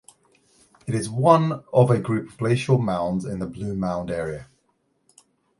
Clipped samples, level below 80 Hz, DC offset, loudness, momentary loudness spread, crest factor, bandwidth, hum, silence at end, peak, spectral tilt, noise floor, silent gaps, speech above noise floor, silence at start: under 0.1%; -52 dBFS; under 0.1%; -23 LUFS; 12 LU; 22 dB; 11.5 kHz; none; 1.15 s; -2 dBFS; -7.5 dB/octave; -69 dBFS; none; 47 dB; 0.85 s